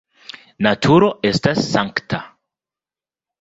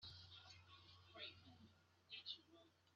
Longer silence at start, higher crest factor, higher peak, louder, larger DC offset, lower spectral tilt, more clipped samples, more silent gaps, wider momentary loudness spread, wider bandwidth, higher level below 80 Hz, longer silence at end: first, 0.6 s vs 0 s; about the same, 18 dB vs 22 dB; first, -2 dBFS vs -40 dBFS; first, -17 LUFS vs -58 LUFS; neither; first, -6 dB/octave vs -1 dB/octave; neither; neither; first, 23 LU vs 13 LU; first, 8 kHz vs 7.2 kHz; first, -50 dBFS vs -86 dBFS; first, 1.15 s vs 0 s